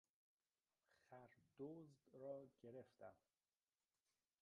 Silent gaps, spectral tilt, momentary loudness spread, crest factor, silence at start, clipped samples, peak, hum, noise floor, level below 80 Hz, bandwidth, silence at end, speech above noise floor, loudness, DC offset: none; -7.5 dB/octave; 10 LU; 20 dB; 0.9 s; under 0.1%; -42 dBFS; none; under -90 dBFS; under -90 dBFS; 6.8 kHz; 1.25 s; over 31 dB; -61 LUFS; under 0.1%